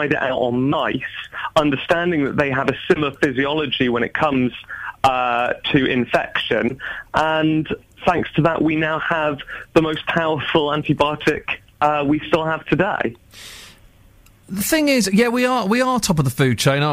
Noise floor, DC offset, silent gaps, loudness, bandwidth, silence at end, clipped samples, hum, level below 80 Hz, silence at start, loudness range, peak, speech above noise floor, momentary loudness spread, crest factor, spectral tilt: -49 dBFS; under 0.1%; none; -19 LUFS; 15.5 kHz; 0 s; under 0.1%; none; -46 dBFS; 0 s; 2 LU; -4 dBFS; 31 dB; 8 LU; 16 dB; -5 dB/octave